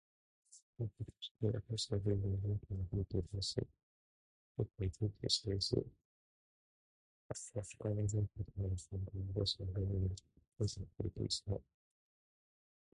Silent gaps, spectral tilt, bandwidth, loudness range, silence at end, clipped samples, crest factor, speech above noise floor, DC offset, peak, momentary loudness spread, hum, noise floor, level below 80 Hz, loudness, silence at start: 0.62-0.73 s, 1.31-1.35 s, 3.83-4.55 s, 6.05-7.29 s; -5.5 dB/octave; 11 kHz; 3 LU; 1.4 s; under 0.1%; 22 dB; over 50 dB; under 0.1%; -20 dBFS; 9 LU; none; under -90 dBFS; -54 dBFS; -41 LUFS; 0.5 s